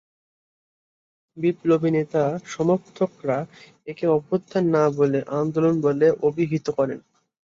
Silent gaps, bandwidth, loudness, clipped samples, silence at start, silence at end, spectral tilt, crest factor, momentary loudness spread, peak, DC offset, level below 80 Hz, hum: none; 7.6 kHz; -22 LUFS; under 0.1%; 1.35 s; 0.6 s; -8 dB/octave; 16 dB; 8 LU; -6 dBFS; under 0.1%; -66 dBFS; none